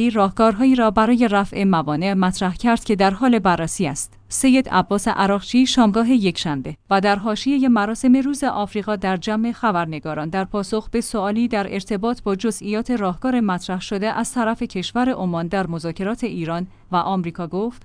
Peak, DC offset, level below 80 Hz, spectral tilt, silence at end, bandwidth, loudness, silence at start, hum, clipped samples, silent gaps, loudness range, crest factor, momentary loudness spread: -2 dBFS; under 0.1%; -44 dBFS; -5 dB/octave; 0.05 s; 10.5 kHz; -20 LUFS; 0 s; none; under 0.1%; none; 5 LU; 16 dB; 9 LU